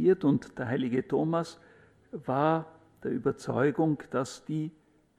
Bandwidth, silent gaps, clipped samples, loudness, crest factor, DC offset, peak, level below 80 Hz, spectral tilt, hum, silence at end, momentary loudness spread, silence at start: 11.5 kHz; none; under 0.1%; -30 LUFS; 18 dB; under 0.1%; -12 dBFS; -66 dBFS; -7.5 dB/octave; none; 0.5 s; 13 LU; 0 s